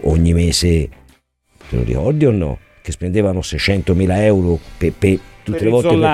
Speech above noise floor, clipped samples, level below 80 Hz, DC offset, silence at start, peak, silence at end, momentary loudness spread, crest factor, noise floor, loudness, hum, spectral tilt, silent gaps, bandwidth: 40 dB; under 0.1%; -28 dBFS; under 0.1%; 0 s; -2 dBFS; 0 s; 11 LU; 14 dB; -55 dBFS; -16 LUFS; none; -6 dB/octave; none; 14 kHz